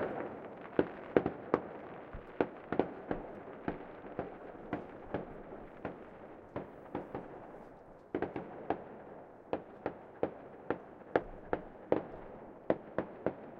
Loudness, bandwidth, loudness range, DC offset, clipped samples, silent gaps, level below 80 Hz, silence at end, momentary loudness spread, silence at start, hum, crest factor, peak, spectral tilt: -40 LUFS; 6.4 kHz; 8 LU; under 0.1%; under 0.1%; none; -62 dBFS; 0 s; 14 LU; 0 s; none; 30 dB; -10 dBFS; -9 dB/octave